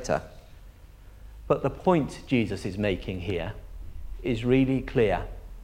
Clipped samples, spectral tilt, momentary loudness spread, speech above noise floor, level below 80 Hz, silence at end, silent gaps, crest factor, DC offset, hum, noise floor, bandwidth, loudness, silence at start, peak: under 0.1%; -7 dB/octave; 20 LU; 22 dB; -42 dBFS; 0 s; none; 20 dB; under 0.1%; none; -48 dBFS; 15.5 kHz; -27 LUFS; 0 s; -8 dBFS